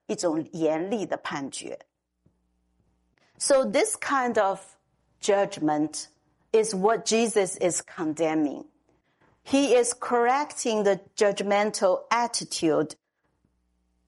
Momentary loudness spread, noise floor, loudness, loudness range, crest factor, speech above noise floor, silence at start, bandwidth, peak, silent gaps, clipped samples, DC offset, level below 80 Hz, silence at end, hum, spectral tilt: 9 LU; -72 dBFS; -25 LUFS; 5 LU; 18 dB; 47 dB; 0.1 s; 11.5 kHz; -8 dBFS; none; under 0.1%; under 0.1%; -72 dBFS; 1.15 s; none; -3.5 dB/octave